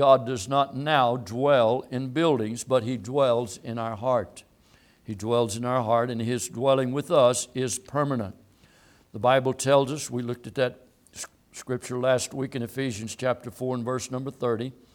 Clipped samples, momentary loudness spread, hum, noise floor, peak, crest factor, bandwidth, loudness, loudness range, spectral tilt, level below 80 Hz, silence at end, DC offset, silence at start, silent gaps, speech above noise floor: under 0.1%; 11 LU; none; -59 dBFS; -4 dBFS; 20 dB; 18.5 kHz; -26 LUFS; 5 LU; -5 dB/octave; -64 dBFS; 0.25 s; under 0.1%; 0 s; none; 34 dB